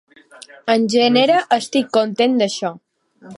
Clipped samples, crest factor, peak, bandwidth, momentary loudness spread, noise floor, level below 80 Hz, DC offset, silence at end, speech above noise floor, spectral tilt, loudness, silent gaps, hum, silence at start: under 0.1%; 16 dB; -2 dBFS; 11.5 kHz; 10 LU; -42 dBFS; -70 dBFS; under 0.1%; 0 s; 25 dB; -4 dB/octave; -17 LUFS; none; none; 0.65 s